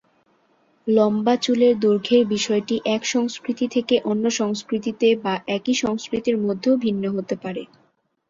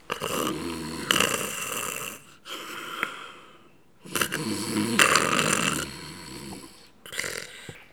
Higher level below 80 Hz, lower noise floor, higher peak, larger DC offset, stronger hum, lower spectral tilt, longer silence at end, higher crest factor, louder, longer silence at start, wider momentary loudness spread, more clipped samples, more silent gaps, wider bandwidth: about the same, -62 dBFS vs -58 dBFS; first, -62 dBFS vs -57 dBFS; second, -6 dBFS vs 0 dBFS; second, under 0.1% vs 0.1%; neither; first, -4.5 dB/octave vs -2 dB/octave; first, 0.65 s vs 0.1 s; second, 16 dB vs 30 dB; first, -21 LUFS vs -26 LUFS; first, 0.85 s vs 0.1 s; second, 8 LU vs 20 LU; neither; neither; second, 7.8 kHz vs over 20 kHz